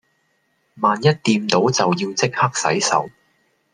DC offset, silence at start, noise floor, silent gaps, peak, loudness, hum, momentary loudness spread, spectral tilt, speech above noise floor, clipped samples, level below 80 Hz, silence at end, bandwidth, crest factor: under 0.1%; 0.75 s; -66 dBFS; none; -2 dBFS; -18 LUFS; none; 4 LU; -4 dB/octave; 48 dB; under 0.1%; -62 dBFS; 0.65 s; 11 kHz; 18 dB